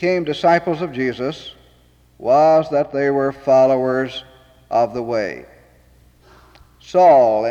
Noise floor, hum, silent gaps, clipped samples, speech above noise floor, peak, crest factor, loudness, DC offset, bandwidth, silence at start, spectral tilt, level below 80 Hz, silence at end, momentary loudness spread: -53 dBFS; none; none; under 0.1%; 36 dB; -4 dBFS; 14 dB; -17 LUFS; under 0.1%; 7.8 kHz; 0 s; -6.5 dB/octave; -54 dBFS; 0 s; 15 LU